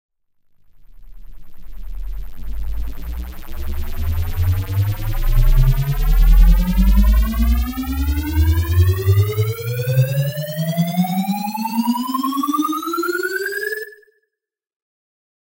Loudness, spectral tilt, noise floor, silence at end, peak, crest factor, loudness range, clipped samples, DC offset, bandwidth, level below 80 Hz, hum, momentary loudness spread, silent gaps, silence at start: -19 LUFS; -6.5 dB/octave; -83 dBFS; 1.5 s; -2 dBFS; 16 dB; 12 LU; under 0.1%; under 0.1%; 17 kHz; -20 dBFS; none; 15 LU; none; 0.8 s